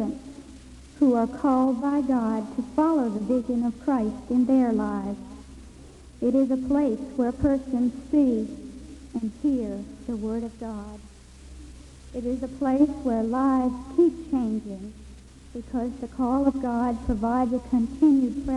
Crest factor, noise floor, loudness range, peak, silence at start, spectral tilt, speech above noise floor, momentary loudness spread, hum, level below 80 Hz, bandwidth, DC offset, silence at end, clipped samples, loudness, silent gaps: 16 dB; -46 dBFS; 6 LU; -10 dBFS; 0 s; -8 dB/octave; 22 dB; 17 LU; none; -46 dBFS; 11 kHz; under 0.1%; 0 s; under 0.1%; -25 LUFS; none